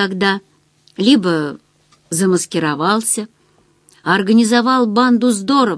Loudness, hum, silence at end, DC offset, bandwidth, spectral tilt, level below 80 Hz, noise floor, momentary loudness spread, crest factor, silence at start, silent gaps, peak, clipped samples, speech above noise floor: -15 LUFS; none; 0 s; under 0.1%; 11 kHz; -4 dB/octave; -64 dBFS; -55 dBFS; 11 LU; 16 dB; 0 s; none; 0 dBFS; under 0.1%; 41 dB